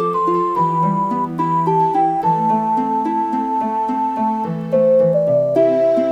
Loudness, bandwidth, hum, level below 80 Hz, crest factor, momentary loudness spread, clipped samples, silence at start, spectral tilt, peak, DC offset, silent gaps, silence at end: -17 LUFS; 9.4 kHz; 50 Hz at -60 dBFS; -58 dBFS; 12 dB; 5 LU; under 0.1%; 0 s; -9 dB/octave; -4 dBFS; under 0.1%; none; 0 s